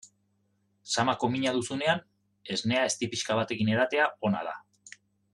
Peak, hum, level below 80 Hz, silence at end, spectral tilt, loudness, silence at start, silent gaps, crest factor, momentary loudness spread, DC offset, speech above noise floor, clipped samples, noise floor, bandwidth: -12 dBFS; none; -70 dBFS; 0.45 s; -4 dB/octave; -28 LUFS; 0.05 s; none; 18 dB; 7 LU; under 0.1%; 44 dB; under 0.1%; -73 dBFS; 12 kHz